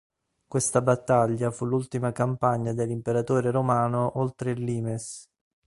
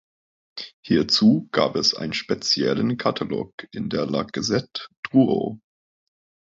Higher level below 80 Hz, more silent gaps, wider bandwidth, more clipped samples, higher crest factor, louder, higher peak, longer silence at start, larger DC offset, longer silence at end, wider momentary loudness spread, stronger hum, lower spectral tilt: about the same, -58 dBFS vs -58 dBFS; second, none vs 0.73-0.83 s, 3.53-3.58 s, 4.97-5.03 s; first, 11.5 kHz vs 7.8 kHz; neither; about the same, 20 dB vs 18 dB; second, -26 LUFS vs -22 LUFS; about the same, -6 dBFS vs -6 dBFS; about the same, 0.5 s vs 0.55 s; neither; second, 0.45 s vs 0.95 s; second, 8 LU vs 16 LU; neither; first, -6.5 dB/octave vs -5 dB/octave